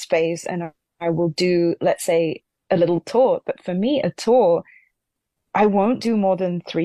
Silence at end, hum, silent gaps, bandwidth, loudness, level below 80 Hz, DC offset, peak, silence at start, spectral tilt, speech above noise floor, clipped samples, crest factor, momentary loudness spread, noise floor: 0 s; none; none; 13 kHz; -20 LUFS; -62 dBFS; under 0.1%; -6 dBFS; 0 s; -6 dB/octave; 60 dB; under 0.1%; 14 dB; 9 LU; -79 dBFS